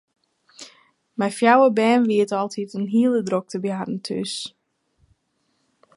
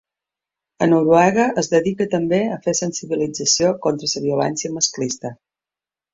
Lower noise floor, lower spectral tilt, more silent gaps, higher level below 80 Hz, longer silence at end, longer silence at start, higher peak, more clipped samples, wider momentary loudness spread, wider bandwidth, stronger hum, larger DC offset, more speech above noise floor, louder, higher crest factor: second, -70 dBFS vs -90 dBFS; first, -5.5 dB/octave vs -4 dB/octave; neither; second, -72 dBFS vs -58 dBFS; first, 1.5 s vs 0.8 s; second, 0.6 s vs 0.8 s; about the same, -2 dBFS vs -2 dBFS; neither; first, 20 LU vs 9 LU; first, 11.5 kHz vs 7.8 kHz; neither; neither; second, 50 dB vs 71 dB; about the same, -21 LUFS vs -19 LUFS; about the same, 20 dB vs 18 dB